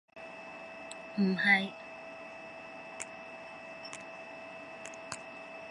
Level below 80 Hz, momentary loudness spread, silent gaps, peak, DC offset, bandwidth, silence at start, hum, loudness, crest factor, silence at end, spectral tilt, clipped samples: -78 dBFS; 19 LU; none; -14 dBFS; under 0.1%; 11.5 kHz; 0.15 s; none; -36 LUFS; 24 dB; 0 s; -4.5 dB/octave; under 0.1%